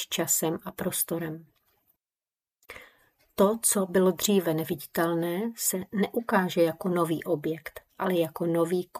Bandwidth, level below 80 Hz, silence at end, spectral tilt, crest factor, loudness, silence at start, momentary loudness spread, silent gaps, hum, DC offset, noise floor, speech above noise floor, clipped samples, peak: 15.5 kHz; -66 dBFS; 0 s; -4 dB/octave; 20 dB; -27 LUFS; 0 s; 14 LU; none; none; under 0.1%; under -90 dBFS; over 63 dB; under 0.1%; -8 dBFS